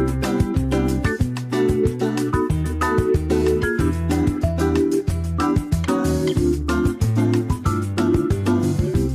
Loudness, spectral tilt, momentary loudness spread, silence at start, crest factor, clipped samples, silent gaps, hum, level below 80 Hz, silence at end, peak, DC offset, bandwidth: -20 LUFS; -7 dB/octave; 3 LU; 0 s; 12 dB; under 0.1%; none; none; -30 dBFS; 0 s; -8 dBFS; under 0.1%; 15.5 kHz